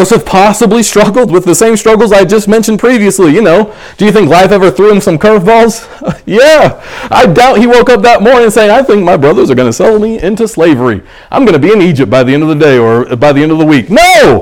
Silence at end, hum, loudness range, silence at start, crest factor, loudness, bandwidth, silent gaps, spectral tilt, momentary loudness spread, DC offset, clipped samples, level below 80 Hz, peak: 0 s; none; 2 LU; 0 s; 4 dB; -5 LUFS; 18 kHz; none; -5 dB/octave; 6 LU; under 0.1%; 7%; -32 dBFS; 0 dBFS